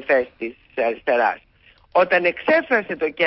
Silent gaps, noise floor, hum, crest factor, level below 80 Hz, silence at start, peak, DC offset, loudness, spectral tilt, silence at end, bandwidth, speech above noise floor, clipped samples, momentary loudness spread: none; -54 dBFS; none; 14 dB; -60 dBFS; 0 s; -6 dBFS; under 0.1%; -20 LUFS; -9 dB/octave; 0 s; 5.8 kHz; 34 dB; under 0.1%; 12 LU